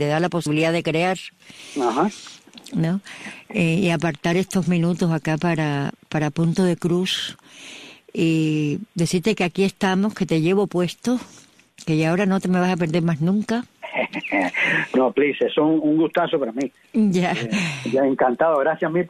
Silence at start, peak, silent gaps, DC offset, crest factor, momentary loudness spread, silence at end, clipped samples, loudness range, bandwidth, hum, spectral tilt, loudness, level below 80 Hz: 0 s; -6 dBFS; none; under 0.1%; 14 dB; 10 LU; 0 s; under 0.1%; 3 LU; 14 kHz; none; -6 dB/octave; -21 LUFS; -58 dBFS